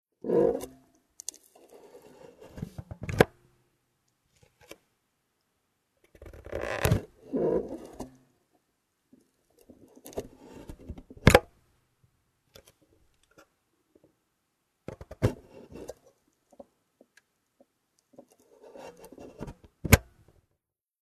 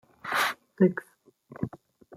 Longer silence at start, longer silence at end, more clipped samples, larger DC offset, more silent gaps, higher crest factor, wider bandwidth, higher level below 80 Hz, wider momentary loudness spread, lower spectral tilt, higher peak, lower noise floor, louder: about the same, 0.25 s vs 0.25 s; first, 1.05 s vs 0 s; neither; neither; neither; first, 34 dB vs 20 dB; second, 13.5 kHz vs 16 kHz; first, -46 dBFS vs -70 dBFS; first, 26 LU vs 12 LU; about the same, -5.5 dB/octave vs -5.5 dB/octave; first, 0 dBFS vs -10 dBFS; first, -82 dBFS vs -52 dBFS; about the same, -28 LUFS vs -28 LUFS